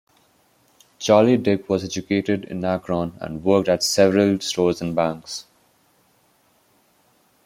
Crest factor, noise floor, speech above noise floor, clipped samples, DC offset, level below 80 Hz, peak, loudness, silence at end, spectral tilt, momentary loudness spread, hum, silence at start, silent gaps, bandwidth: 20 dB; -61 dBFS; 41 dB; under 0.1%; under 0.1%; -58 dBFS; -2 dBFS; -20 LUFS; 2.05 s; -5 dB/octave; 11 LU; none; 1 s; none; 16.5 kHz